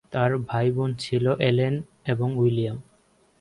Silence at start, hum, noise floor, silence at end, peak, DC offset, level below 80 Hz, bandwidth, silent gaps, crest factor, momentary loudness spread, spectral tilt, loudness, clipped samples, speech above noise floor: 0.1 s; none; -62 dBFS; 0.6 s; -6 dBFS; under 0.1%; -58 dBFS; 11 kHz; none; 18 dB; 8 LU; -7.5 dB/octave; -24 LUFS; under 0.1%; 39 dB